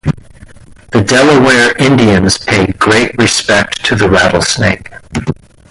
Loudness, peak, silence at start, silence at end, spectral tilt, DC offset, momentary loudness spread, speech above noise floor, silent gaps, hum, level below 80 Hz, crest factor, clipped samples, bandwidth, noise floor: -9 LUFS; 0 dBFS; 0.05 s; 0.4 s; -4.5 dB/octave; under 0.1%; 13 LU; 26 dB; none; none; -32 dBFS; 10 dB; under 0.1%; 11.5 kHz; -35 dBFS